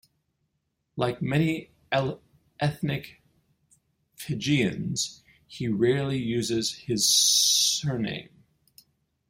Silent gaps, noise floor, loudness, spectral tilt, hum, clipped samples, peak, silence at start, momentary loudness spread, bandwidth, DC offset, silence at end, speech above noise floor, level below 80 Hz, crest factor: none; -78 dBFS; -25 LUFS; -3 dB/octave; none; under 0.1%; -8 dBFS; 0.95 s; 16 LU; 16.5 kHz; under 0.1%; 1.05 s; 52 dB; -60 dBFS; 20 dB